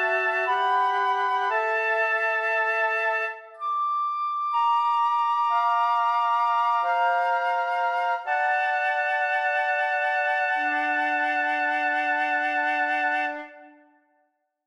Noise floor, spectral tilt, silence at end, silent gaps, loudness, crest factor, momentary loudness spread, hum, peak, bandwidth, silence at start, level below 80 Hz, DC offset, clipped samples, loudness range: -71 dBFS; -1 dB/octave; 1 s; none; -24 LUFS; 12 dB; 3 LU; none; -12 dBFS; 11 kHz; 0 s; -84 dBFS; under 0.1%; under 0.1%; 1 LU